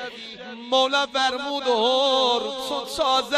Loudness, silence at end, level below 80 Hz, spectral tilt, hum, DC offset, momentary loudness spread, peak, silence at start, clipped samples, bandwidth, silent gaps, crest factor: -22 LUFS; 0 s; -60 dBFS; -1.5 dB/octave; none; under 0.1%; 15 LU; -6 dBFS; 0 s; under 0.1%; 14.5 kHz; none; 16 dB